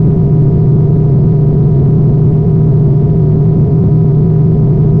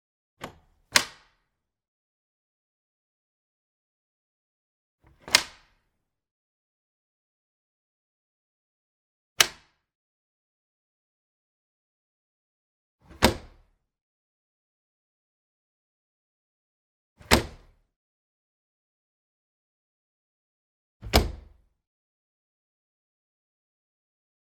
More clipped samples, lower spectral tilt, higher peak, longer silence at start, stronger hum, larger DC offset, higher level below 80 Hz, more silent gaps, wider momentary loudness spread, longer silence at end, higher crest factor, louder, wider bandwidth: neither; first, -14 dB/octave vs -2.5 dB/octave; about the same, 0 dBFS vs 0 dBFS; second, 0 s vs 0.4 s; neither; neither; first, -24 dBFS vs -44 dBFS; second, none vs 1.88-4.98 s, 6.31-9.36 s, 9.95-12.99 s, 14.01-17.16 s, 17.96-21.00 s; second, 0 LU vs 21 LU; second, 0 s vs 3.15 s; second, 6 dB vs 36 dB; first, -9 LUFS vs -24 LUFS; second, 1.7 kHz vs 19 kHz